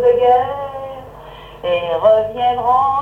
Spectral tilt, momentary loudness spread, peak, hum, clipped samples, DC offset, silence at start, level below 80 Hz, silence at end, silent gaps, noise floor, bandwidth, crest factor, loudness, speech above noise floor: -6 dB/octave; 21 LU; -2 dBFS; none; under 0.1%; under 0.1%; 0 s; -46 dBFS; 0 s; none; -36 dBFS; 4.6 kHz; 14 dB; -15 LUFS; 21 dB